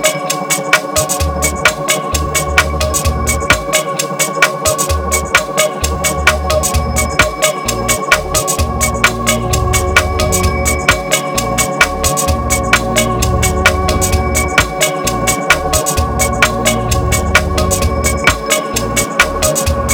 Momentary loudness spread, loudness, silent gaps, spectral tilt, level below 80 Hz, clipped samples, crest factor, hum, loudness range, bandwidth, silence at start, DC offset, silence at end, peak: 3 LU; -13 LUFS; none; -3 dB/octave; -22 dBFS; 0.3%; 14 dB; none; 1 LU; over 20 kHz; 0 s; under 0.1%; 0 s; 0 dBFS